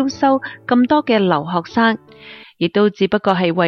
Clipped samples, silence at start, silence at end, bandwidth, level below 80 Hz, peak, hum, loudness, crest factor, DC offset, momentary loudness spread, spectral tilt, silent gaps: under 0.1%; 0 s; 0 s; 6.6 kHz; -56 dBFS; -2 dBFS; none; -17 LUFS; 14 dB; under 0.1%; 6 LU; -6.5 dB/octave; none